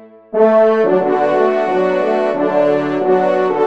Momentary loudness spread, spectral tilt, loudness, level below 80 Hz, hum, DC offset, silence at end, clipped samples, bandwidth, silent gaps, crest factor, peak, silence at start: 4 LU; -7.5 dB/octave; -14 LUFS; -64 dBFS; none; 0.5%; 0 s; under 0.1%; 7.8 kHz; none; 14 dB; 0 dBFS; 0 s